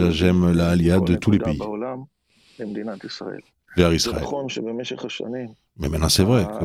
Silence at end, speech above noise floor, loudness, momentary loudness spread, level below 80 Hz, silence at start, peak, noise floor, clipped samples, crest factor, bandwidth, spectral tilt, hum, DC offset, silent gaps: 0 s; 38 dB; -21 LUFS; 15 LU; -40 dBFS; 0 s; -2 dBFS; -59 dBFS; under 0.1%; 18 dB; 15 kHz; -5.5 dB/octave; none; under 0.1%; none